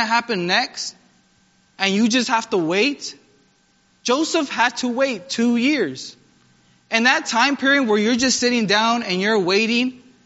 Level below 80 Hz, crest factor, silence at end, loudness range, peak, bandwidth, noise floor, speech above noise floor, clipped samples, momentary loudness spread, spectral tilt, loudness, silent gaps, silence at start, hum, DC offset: -64 dBFS; 20 dB; 0.3 s; 4 LU; 0 dBFS; 8 kHz; -60 dBFS; 41 dB; under 0.1%; 9 LU; -2 dB/octave; -19 LUFS; none; 0 s; none; under 0.1%